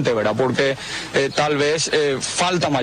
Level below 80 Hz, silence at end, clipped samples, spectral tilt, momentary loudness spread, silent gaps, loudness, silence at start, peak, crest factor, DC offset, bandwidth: -52 dBFS; 0 s; under 0.1%; -3.5 dB/octave; 3 LU; none; -19 LUFS; 0 s; -6 dBFS; 14 dB; under 0.1%; 13 kHz